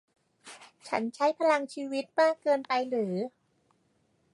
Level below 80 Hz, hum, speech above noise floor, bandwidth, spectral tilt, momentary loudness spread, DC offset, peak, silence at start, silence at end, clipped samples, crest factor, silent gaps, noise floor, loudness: -84 dBFS; none; 43 dB; 11.5 kHz; -5 dB/octave; 15 LU; under 0.1%; -12 dBFS; 0.45 s; 1.05 s; under 0.1%; 20 dB; none; -71 dBFS; -29 LUFS